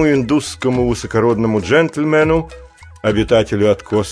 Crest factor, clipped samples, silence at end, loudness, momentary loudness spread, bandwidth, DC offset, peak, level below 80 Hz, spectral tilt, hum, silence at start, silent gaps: 14 dB; under 0.1%; 0 s; -15 LUFS; 5 LU; 11 kHz; under 0.1%; -2 dBFS; -36 dBFS; -6 dB/octave; none; 0 s; none